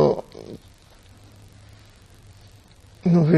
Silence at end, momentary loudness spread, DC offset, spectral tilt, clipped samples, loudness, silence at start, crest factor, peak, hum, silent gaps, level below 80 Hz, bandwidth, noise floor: 0 s; 29 LU; under 0.1%; -9 dB/octave; under 0.1%; -22 LUFS; 0 s; 20 dB; -4 dBFS; none; none; -54 dBFS; 8 kHz; -50 dBFS